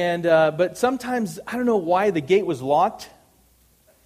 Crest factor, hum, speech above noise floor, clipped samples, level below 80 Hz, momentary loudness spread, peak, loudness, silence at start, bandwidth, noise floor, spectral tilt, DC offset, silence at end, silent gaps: 16 dB; none; 38 dB; under 0.1%; -60 dBFS; 8 LU; -6 dBFS; -21 LUFS; 0 s; 15.5 kHz; -58 dBFS; -5.5 dB/octave; under 0.1%; 1 s; none